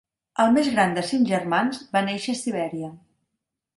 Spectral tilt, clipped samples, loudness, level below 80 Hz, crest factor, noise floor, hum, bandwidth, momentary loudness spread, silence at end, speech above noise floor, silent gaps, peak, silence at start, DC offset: -5 dB/octave; under 0.1%; -23 LUFS; -66 dBFS; 18 dB; -82 dBFS; none; 11.5 kHz; 12 LU; 0.8 s; 60 dB; none; -6 dBFS; 0.4 s; under 0.1%